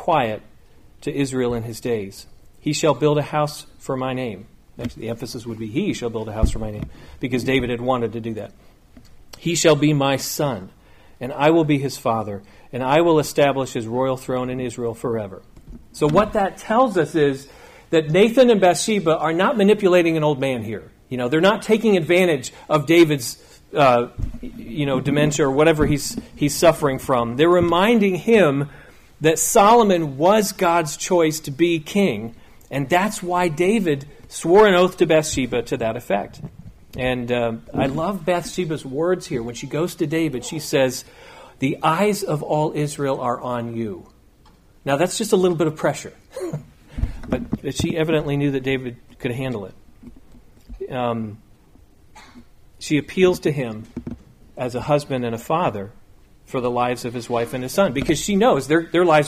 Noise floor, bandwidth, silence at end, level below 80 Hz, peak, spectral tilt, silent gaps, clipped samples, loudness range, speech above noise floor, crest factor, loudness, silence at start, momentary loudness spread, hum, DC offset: -51 dBFS; 15.5 kHz; 0 s; -40 dBFS; -4 dBFS; -5 dB/octave; none; under 0.1%; 8 LU; 32 dB; 16 dB; -20 LUFS; 0 s; 16 LU; none; under 0.1%